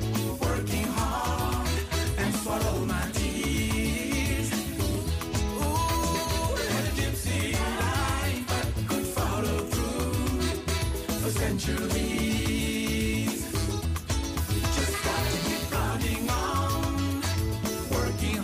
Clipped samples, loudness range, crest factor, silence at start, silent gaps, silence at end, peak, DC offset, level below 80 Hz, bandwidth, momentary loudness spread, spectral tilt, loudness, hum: under 0.1%; 1 LU; 12 dB; 0 s; none; 0 s; -16 dBFS; under 0.1%; -34 dBFS; 15.5 kHz; 2 LU; -4.5 dB/octave; -28 LUFS; none